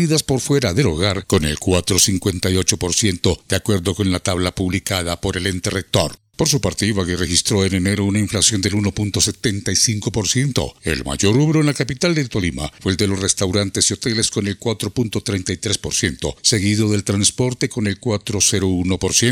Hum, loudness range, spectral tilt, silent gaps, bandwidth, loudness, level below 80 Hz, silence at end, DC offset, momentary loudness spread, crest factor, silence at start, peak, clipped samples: none; 2 LU; -4 dB/octave; none; 17 kHz; -18 LUFS; -42 dBFS; 0 s; under 0.1%; 6 LU; 18 dB; 0 s; 0 dBFS; under 0.1%